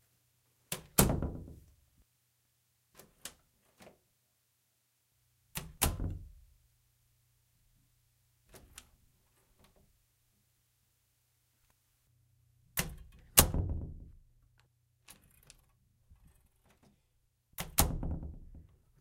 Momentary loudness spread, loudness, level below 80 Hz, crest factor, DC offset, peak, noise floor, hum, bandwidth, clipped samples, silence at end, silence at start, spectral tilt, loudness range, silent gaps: 29 LU; -33 LUFS; -48 dBFS; 38 dB; under 0.1%; -2 dBFS; -77 dBFS; none; 16 kHz; under 0.1%; 0.4 s; 0.7 s; -3 dB/octave; 23 LU; none